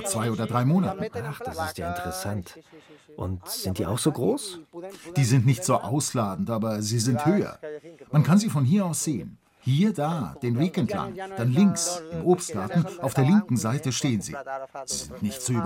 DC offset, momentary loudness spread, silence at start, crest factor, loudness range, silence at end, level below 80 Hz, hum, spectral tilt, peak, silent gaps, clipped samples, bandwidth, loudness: under 0.1%; 13 LU; 0 s; 16 dB; 5 LU; 0 s; -60 dBFS; none; -5.5 dB/octave; -8 dBFS; none; under 0.1%; 16.5 kHz; -25 LUFS